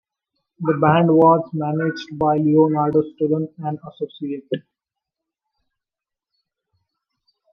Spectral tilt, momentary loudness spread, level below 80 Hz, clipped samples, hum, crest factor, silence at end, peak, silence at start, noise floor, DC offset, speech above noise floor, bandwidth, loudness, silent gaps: -9 dB/octave; 15 LU; -62 dBFS; under 0.1%; none; 20 dB; 2.95 s; -2 dBFS; 0.6 s; -87 dBFS; under 0.1%; 69 dB; 6.2 kHz; -19 LUFS; none